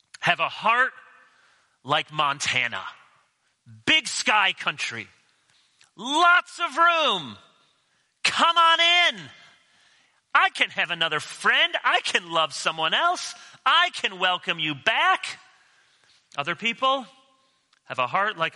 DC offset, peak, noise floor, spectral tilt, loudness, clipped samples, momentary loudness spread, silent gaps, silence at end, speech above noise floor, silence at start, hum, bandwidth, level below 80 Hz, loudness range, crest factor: under 0.1%; -4 dBFS; -68 dBFS; -1.5 dB/octave; -22 LUFS; under 0.1%; 12 LU; none; 0.05 s; 45 dB; 0.2 s; none; 11.5 kHz; -74 dBFS; 5 LU; 22 dB